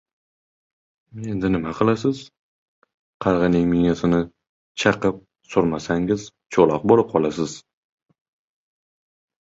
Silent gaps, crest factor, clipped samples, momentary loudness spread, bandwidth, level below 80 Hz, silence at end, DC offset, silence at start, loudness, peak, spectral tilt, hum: 2.39-2.82 s, 2.94-3.20 s, 4.49-4.75 s; 20 dB; under 0.1%; 13 LU; 8 kHz; -48 dBFS; 1.85 s; under 0.1%; 1.15 s; -21 LUFS; -2 dBFS; -6.5 dB/octave; none